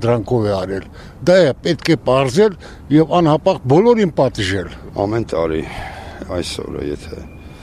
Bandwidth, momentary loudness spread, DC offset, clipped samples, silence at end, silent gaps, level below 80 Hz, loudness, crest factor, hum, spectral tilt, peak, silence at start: 13.5 kHz; 16 LU; under 0.1%; under 0.1%; 0 s; none; -38 dBFS; -16 LUFS; 14 dB; none; -6.5 dB/octave; -2 dBFS; 0 s